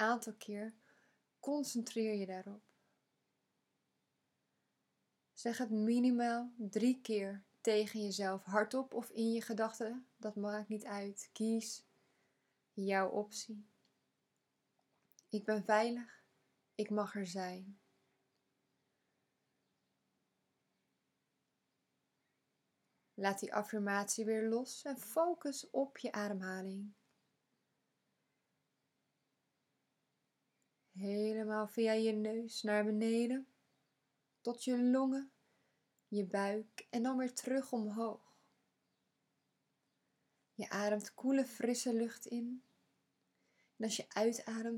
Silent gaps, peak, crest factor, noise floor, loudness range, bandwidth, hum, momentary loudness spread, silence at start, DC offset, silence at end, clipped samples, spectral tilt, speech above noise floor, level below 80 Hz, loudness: none; -18 dBFS; 24 dB; -85 dBFS; 9 LU; 17 kHz; none; 12 LU; 0 s; under 0.1%; 0 s; under 0.1%; -4.5 dB/octave; 47 dB; under -90 dBFS; -39 LUFS